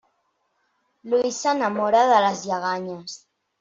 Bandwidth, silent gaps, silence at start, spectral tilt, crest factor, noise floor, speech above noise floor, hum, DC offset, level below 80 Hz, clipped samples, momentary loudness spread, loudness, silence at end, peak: 7.8 kHz; none; 1.05 s; -3.5 dB/octave; 18 dB; -71 dBFS; 50 dB; none; under 0.1%; -70 dBFS; under 0.1%; 18 LU; -21 LUFS; 0.45 s; -6 dBFS